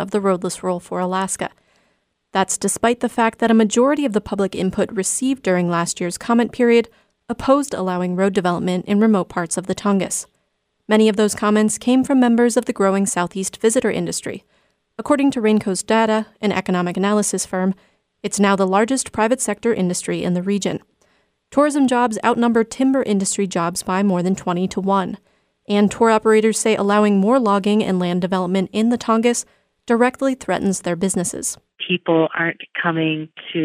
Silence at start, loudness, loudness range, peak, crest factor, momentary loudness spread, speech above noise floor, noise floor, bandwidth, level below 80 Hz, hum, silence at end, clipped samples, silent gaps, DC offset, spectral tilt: 0 s; -18 LUFS; 3 LU; -2 dBFS; 16 dB; 8 LU; 52 dB; -70 dBFS; 15.5 kHz; -56 dBFS; none; 0 s; under 0.1%; none; under 0.1%; -5 dB/octave